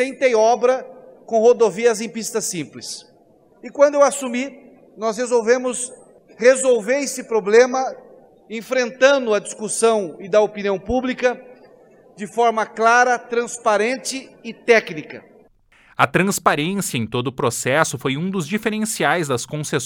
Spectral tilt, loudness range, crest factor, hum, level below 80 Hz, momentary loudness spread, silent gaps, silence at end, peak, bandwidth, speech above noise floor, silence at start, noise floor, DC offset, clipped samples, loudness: -4 dB/octave; 3 LU; 20 dB; none; -54 dBFS; 15 LU; none; 0 s; 0 dBFS; 18.5 kHz; 35 dB; 0 s; -53 dBFS; under 0.1%; under 0.1%; -19 LUFS